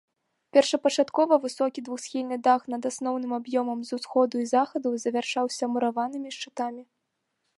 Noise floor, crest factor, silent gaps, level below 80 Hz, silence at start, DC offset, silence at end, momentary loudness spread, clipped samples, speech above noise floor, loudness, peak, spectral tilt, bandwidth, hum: -79 dBFS; 22 dB; none; -82 dBFS; 0.55 s; under 0.1%; 0.75 s; 10 LU; under 0.1%; 53 dB; -26 LUFS; -6 dBFS; -3 dB/octave; 11.5 kHz; none